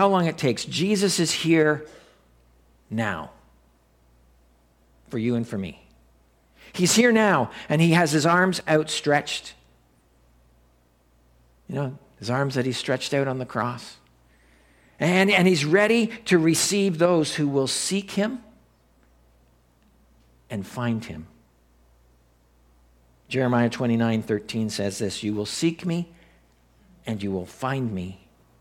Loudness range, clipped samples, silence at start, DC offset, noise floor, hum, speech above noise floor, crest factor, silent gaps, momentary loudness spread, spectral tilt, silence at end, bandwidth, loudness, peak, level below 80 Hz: 15 LU; under 0.1%; 0 s; under 0.1%; -61 dBFS; none; 38 dB; 20 dB; none; 15 LU; -4.5 dB/octave; 0.45 s; 17 kHz; -23 LUFS; -4 dBFS; -60 dBFS